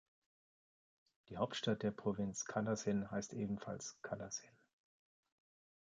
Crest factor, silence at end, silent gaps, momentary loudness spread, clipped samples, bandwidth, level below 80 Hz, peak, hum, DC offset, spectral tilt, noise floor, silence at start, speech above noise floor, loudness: 20 dB; 1.35 s; none; 9 LU; under 0.1%; 9.4 kHz; -72 dBFS; -24 dBFS; none; under 0.1%; -4.5 dB/octave; under -90 dBFS; 1.3 s; over 48 dB; -42 LUFS